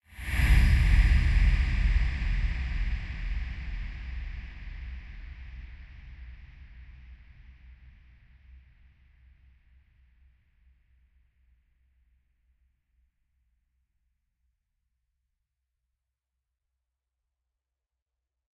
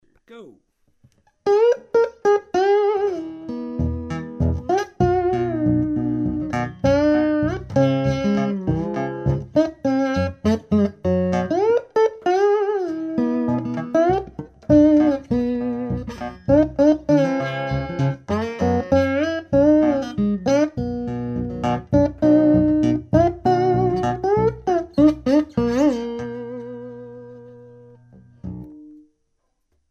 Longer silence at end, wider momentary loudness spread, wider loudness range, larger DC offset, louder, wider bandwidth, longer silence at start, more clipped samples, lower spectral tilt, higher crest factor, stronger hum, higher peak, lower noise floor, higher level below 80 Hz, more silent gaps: first, 10.85 s vs 0.95 s; first, 26 LU vs 12 LU; first, 26 LU vs 4 LU; neither; second, -29 LUFS vs -20 LUFS; first, 12 kHz vs 7.2 kHz; second, 0.15 s vs 0.3 s; neither; second, -6 dB/octave vs -8 dB/octave; about the same, 22 dB vs 18 dB; neither; second, -10 dBFS vs -2 dBFS; first, -87 dBFS vs -70 dBFS; first, -32 dBFS vs -40 dBFS; neither